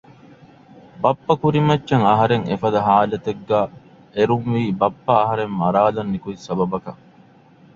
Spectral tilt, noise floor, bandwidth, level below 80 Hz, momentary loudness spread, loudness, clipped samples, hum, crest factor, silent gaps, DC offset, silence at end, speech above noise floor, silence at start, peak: -8 dB/octave; -49 dBFS; 7.6 kHz; -52 dBFS; 10 LU; -19 LUFS; under 0.1%; none; 18 dB; none; under 0.1%; 0.8 s; 31 dB; 0.95 s; -2 dBFS